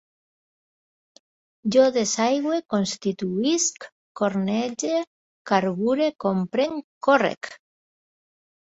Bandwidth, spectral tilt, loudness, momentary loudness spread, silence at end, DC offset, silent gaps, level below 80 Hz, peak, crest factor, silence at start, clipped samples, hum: 8.2 kHz; -4 dB/octave; -23 LUFS; 8 LU; 1.2 s; under 0.1%; 3.92-4.15 s, 5.07-5.45 s, 6.84-7.01 s, 7.37-7.41 s; -68 dBFS; -4 dBFS; 20 dB; 1.65 s; under 0.1%; none